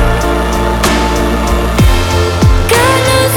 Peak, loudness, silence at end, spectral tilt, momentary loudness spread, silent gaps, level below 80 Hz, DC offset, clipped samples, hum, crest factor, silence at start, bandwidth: 0 dBFS; -11 LUFS; 0 s; -5 dB/octave; 4 LU; none; -14 dBFS; under 0.1%; under 0.1%; none; 10 dB; 0 s; 19.5 kHz